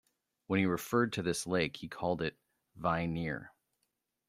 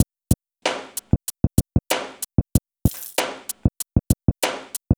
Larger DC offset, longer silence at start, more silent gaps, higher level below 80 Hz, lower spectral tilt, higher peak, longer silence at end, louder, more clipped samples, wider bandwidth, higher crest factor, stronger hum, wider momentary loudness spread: second, under 0.1% vs 0.3%; first, 0.5 s vs 0 s; neither; second, -62 dBFS vs -32 dBFS; about the same, -5.5 dB/octave vs -5 dB/octave; second, -16 dBFS vs -2 dBFS; first, 0.8 s vs 0.05 s; second, -34 LUFS vs -24 LUFS; neither; second, 16 kHz vs over 20 kHz; about the same, 20 dB vs 20 dB; neither; about the same, 7 LU vs 5 LU